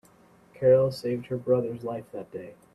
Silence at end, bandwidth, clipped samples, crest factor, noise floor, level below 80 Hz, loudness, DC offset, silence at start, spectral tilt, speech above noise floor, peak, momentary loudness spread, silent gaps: 0.2 s; 12 kHz; under 0.1%; 18 dB; -57 dBFS; -64 dBFS; -26 LUFS; under 0.1%; 0.6 s; -8 dB/octave; 31 dB; -10 dBFS; 18 LU; none